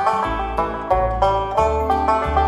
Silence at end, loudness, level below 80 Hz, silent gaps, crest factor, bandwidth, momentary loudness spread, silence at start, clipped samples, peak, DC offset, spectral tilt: 0 s; -19 LUFS; -28 dBFS; none; 16 dB; 14 kHz; 4 LU; 0 s; under 0.1%; -2 dBFS; under 0.1%; -6.5 dB/octave